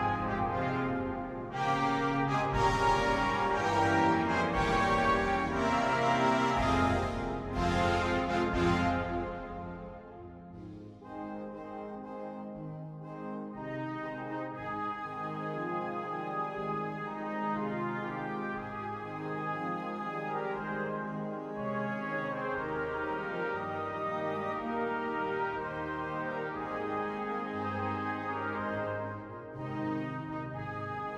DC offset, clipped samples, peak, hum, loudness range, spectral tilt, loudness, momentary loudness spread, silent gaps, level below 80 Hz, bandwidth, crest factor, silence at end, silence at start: under 0.1%; under 0.1%; -16 dBFS; none; 12 LU; -6 dB/octave; -33 LUFS; 14 LU; none; -50 dBFS; 13.5 kHz; 18 dB; 0 s; 0 s